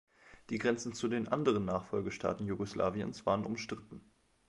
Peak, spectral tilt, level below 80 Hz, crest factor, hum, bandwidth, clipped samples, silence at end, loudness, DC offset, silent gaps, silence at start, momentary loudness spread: -16 dBFS; -6 dB/octave; -62 dBFS; 20 dB; none; 11.5 kHz; under 0.1%; 0.5 s; -35 LUFS; under 0.1%; none; 0.25 s; 10 LU